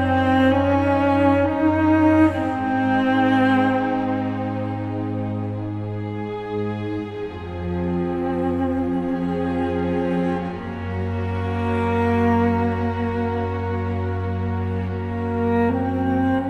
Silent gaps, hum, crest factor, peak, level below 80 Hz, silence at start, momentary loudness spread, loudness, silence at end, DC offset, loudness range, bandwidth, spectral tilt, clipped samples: none; none; 16 dB; -6 dBFS; -48 dBFS; 0 s; 10 LU; -22 LUFS; 0 s; under 0.1%; 8 LU; 8 kHz; -8.5 dB/octave; under 0.1%